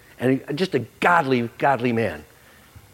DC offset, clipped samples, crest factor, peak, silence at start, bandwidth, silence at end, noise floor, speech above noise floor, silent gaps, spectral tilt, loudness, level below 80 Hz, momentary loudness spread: under 0.1%; under 0.1%; 20 dB; -2 dBFS; 0.2 s; 16 kHz; 0.7 s; -49 dBFS; 27 dB; none; -6.5 dB/octave; -22 LUFS; -60 dBFS; 6 LU